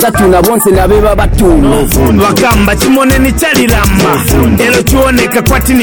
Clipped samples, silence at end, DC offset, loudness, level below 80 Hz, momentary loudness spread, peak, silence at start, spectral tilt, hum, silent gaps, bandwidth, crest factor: under 0.1%; 0 s; 0.5%; -7 LUFS; -14 dBFS; 2 LU; 0 dBFS; 0 s; -5 dB/octave; none; none; 17.5 kHz; 6 dB